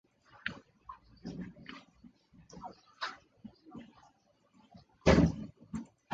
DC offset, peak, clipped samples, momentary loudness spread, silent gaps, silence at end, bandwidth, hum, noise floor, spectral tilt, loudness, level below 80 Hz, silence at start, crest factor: under 0.1%; -10 dBFS; under 0.1%; 26 LU; none; 0 s; 8 kHz; none; -69 dBFS; -6.5 dB/octave; -34 LUFS; -48 dBFS; 0.45 s; 28 dB